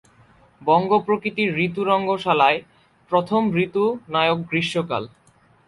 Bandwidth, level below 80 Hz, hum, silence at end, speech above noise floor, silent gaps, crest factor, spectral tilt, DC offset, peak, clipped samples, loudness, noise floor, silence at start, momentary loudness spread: 11.5 kHz; -60 dBFS; none; 0.6 s; 34 dB; none; 18 dB; -6.5 dB/octave; under 0.1%; -4 dBFS; under 0.1%; -21 LUFS; -54 dBFS; 0.6 s; 8 LU